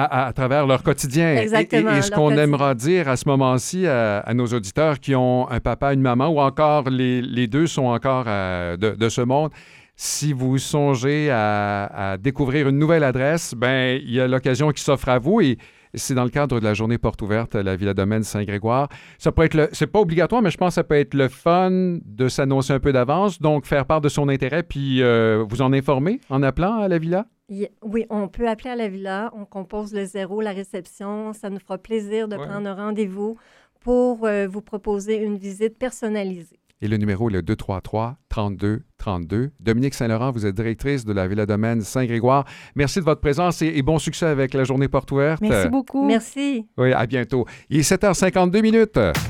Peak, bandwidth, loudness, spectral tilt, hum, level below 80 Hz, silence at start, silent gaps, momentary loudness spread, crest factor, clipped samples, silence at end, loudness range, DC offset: -2 dBFS; 17 kHz; -21 LUFS; -6 dB/octave; none; -42 dBFS; 0 s; none; 10 LU; 18 dB; under 0.1%; 0 s; 6 LU; under 0.1%